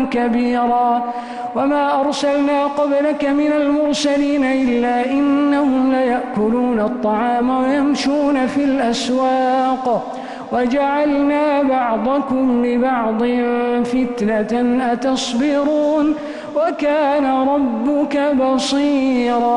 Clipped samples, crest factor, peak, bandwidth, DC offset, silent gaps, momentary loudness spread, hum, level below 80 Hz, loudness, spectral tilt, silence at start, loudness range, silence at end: under 0.1%; 10 dB; -6 dBFS; 11 kHz; under 0.1%; none; 3 LU; none; -48 dBFS; -17 LUFS; -5 dB/octave; 0 s; 1 LU; 0 s